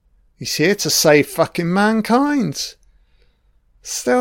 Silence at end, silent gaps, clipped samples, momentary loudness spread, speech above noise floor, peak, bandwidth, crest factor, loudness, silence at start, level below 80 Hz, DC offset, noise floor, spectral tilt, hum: 0 s; none; under 0.1%; 14 LU; 41 dB; 0 dBFS; 17 kHz; 18 dB; -17 LUFS; 0.4 s; -54 dBFS; under 0.1%; -57 dBFS; -4 dB/octave; none